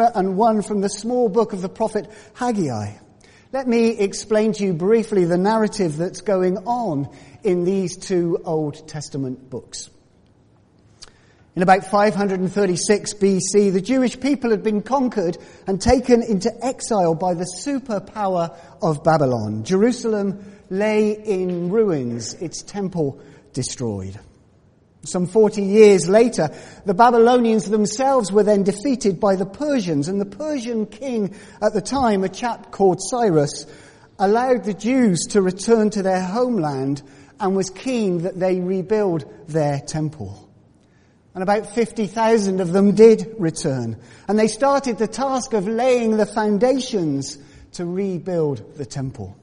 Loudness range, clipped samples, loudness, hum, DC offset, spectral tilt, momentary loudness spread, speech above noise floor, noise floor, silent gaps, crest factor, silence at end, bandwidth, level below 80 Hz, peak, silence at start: 7 LU; under 0.1%; -20 LUFS; none; under 0.1%; -5.5 dB/octave; 12 LU; 36 dB; -55 dBFS; none; 18 dB; 0.1 s; 10.5 kHz; -48 dBFS; 0 dBFS; 0 s